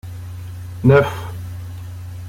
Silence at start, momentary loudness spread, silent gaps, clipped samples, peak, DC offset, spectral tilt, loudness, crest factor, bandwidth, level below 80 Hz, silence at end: 0.05 s; 19 LU; none; under 0.1%; -2 dBFS; under 0.1%; -8 dB/octave; -16 LUFS; 18 dB; 16 kHz; -44 dBFS; 0 s